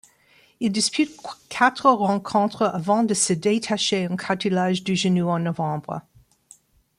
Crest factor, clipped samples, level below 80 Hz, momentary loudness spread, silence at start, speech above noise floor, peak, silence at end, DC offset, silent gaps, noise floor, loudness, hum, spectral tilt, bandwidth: 20 dB; under 0.1%; -64 dBFS; 8 LU; 0.6 s; 36 dB; -4 dBFS; 1 s; under 0.1%; none; -58 dBFS; -22 LUFS; none; -4.5 dB/octave; 12.5 kHz